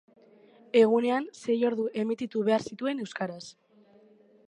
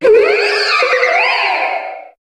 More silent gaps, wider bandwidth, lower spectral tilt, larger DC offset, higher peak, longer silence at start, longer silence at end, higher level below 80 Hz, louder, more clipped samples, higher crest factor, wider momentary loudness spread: neither; about the same, 10.5 kHz vs 11.5 kHz; first, -5.5 dB/octave vs -1 dB/octave; neither; second, -10 dBFS vs 0 dBFS; first, 0.75 s vs 0 s; first, 1 s vs 0.15 s; second, -78 dBFS vs -56 dBFS; second, -28 LUFS vs -12 LUFS; neither; first, 18 dB vs 12 dB; first, 13 LU vs 9 LU